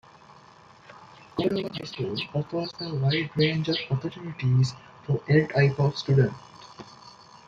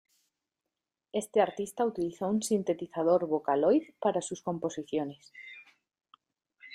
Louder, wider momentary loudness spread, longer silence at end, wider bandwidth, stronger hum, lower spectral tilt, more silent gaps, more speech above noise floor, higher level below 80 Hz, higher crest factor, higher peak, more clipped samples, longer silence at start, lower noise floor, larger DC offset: first, -26 LUFS vs -30 LUFS; first, 20 LU vs 15 LU; first, 0.35 s vs 0 s; second, 7.6 kHz vs 15.5 kHz; neither; first, -7 dB/octave vs -5.5 dB/octave; neither; second, 27 dB vs 59 dB; first, -60 dBFS vs -74 dBFS; about the same, 18 dB vs 18 dB; first, -8 dBFS vs -14 dBFS; neither; second, 0.9 s vs 1.15 s; second, -52 dBFS vs -89 dBFS; neither